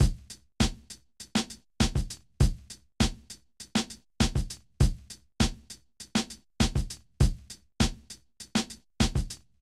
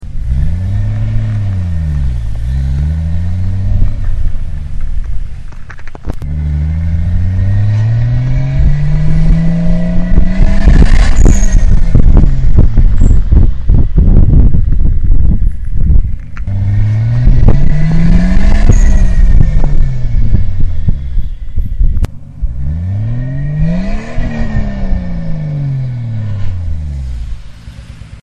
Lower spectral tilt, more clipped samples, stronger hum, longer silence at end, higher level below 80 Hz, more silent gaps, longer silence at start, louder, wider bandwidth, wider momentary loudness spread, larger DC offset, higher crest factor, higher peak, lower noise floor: second, -4.5 dB/octave vs -7.5 dB/octave; second, under 0.1% vs 3%; neither; first, 0.25 s vs 0.05 s; second, -34 dBFS vs -10 dBFS; neither; about the same, 0 s vs 0 s; second, -30 LUFS vs -14 LUFS; first, 15 kHz vs 7.6 kHz; first, 18 LU vs 12 LU; neither; first, 20 dB vs 8 dB; second, -10 dBFS vs 0 dBFS; first, -49 dBFS vs -29 dBFS